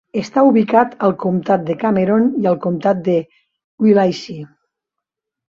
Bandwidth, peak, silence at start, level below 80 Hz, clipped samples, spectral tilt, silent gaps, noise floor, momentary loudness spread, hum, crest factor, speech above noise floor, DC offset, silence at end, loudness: 7.2 kHz; -2 dBFS; 0.15 s; -60 dBFS; under 0.1%; -8 dB/octave; 3.64-3.78 s; -82 dBFS; 7 LU; none; 14 dB; 67 dB; under 0.1%; 1.05 s; -16 LUFS